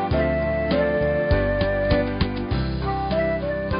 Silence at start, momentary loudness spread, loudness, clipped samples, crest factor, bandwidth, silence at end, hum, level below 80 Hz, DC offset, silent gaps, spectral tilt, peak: 0 s; 4 LU; -23 LUFS; under 0.1%; 14 dB; 5.4 kHz; 0 s; none; -30 dBFS; under 0.1%; none; -11.5 dB/octave; -8 dBFS